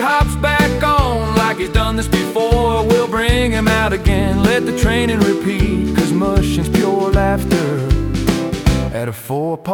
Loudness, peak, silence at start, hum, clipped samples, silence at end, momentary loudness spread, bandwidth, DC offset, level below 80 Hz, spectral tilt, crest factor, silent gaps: -16 LUFS; -2 dBFS; 0 s; none; under 0.1%; 0 s; 3 LU; 18 kHz; under 0.1%; -24 dBFS; -6 dB/octave; 14 dB; none